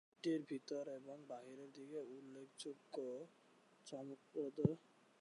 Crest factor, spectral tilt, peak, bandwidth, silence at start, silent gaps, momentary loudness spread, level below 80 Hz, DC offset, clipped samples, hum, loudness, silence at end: 26 dB; -6.5 dB/octave; -22 dBFS; 11 kHz; 0.25 s; none; 15 LU; -80 dBFS; under 0.1%; under 0.1%; none; -48 LUFS; 0.4 s